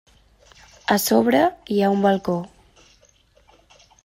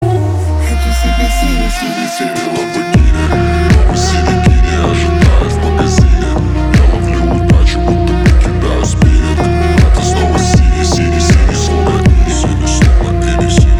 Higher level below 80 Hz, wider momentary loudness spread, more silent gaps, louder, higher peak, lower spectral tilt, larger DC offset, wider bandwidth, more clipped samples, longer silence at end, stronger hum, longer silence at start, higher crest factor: second, -58 dBFS vs -12 dBFS; first, 11 LU vs 4 LU; neither; second, -20 LUFS vs -11 LUFS; about the same, -2 dBFS vs 0 dBFS; about the same, -5 dB/octave vs -6 dB/octave; neither; first, 16 kHz vs 13.5 kHz; neither; first, 1.55 s vs 0 s; neither; first, 0.9 s vs 0 s; first, 20 dB vs 10 dB